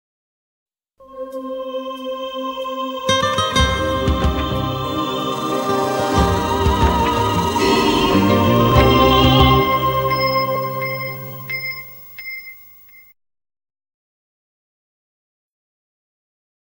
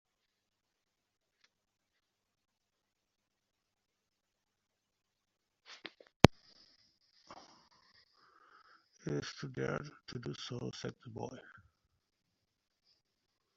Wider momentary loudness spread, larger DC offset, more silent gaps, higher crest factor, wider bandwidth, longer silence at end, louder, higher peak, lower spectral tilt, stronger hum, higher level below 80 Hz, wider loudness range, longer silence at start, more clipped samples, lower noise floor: second, 16 LU vs 29 LU; neither; second, none vs 6.16-6.20 s; second, 18 dB vs 42 dB; first, 18 kHz vs 7.4 kHz; first, 4 s vs 2.15 s; first, -17 LUFS vs -36 LUFS; about the same, 0 dBFS vs 0 dBFS; about the same, -5.5 dB/octave vs -5 dB/octave; neither; first, -30 dBFS vs -62 dBFS; first, 15 LU vs 12 LU; second, 1 s vs 5.7 s; neither; second, -45 dBFS vs -86 dBFS